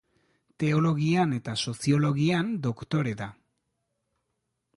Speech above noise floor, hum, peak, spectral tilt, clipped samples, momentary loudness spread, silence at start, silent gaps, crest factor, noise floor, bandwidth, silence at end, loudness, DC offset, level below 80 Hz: 54 dB; none; -12 dBFS; -6.5 dB/octave; under 0.1%; 7 LU; 0.6 s; none; 16 dB; -80 dBFS; 11.5 kHz; 1.45 s; -27 LUFS; under 0.1%; -62 dBFS